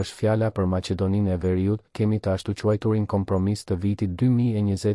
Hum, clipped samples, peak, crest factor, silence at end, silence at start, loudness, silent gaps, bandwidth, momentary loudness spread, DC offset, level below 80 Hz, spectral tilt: none; under 0.1%; -10 dBFS; 12 dB; 0 s; 0 s; -24 LUFS; none; 12 kHz; 4 LU; under 0.1%; -54 dBFS; -8 dB/octave